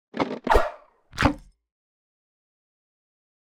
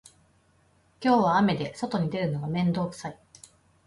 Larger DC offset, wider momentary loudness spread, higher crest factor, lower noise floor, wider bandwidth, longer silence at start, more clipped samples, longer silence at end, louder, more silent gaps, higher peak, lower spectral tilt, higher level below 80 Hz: neither; first, 15 LU vs 11 LU; first, 24 dB vs 18 dB; second, -45 dBFS vs -64 dBFS; first, 18 kHz vs 11.5 kHz; second, 0.15 s vs 1 s; neither; first, 2.1 s vs 0.75 s; about the same, -25 LUFS vs -26 LUFS; neither; first, -4 dBFS vs -10 dBFS; second, -5.5 dB/octave vs -7 dB/octave; first, -36 dBFS vs -62 dBFS